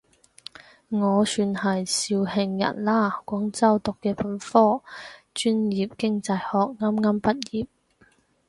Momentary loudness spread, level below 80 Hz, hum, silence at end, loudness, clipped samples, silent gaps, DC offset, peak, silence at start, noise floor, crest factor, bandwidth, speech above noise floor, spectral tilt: 12 LU; -60 dBFS; none; 0.85 s; -24 LUFS; under 0.1%; none; under 0.1%; -4 dBFS; 0.9 s; -61 dBFS; 20 dB; 11.5 kHz; 37 dB; -5 dB/octave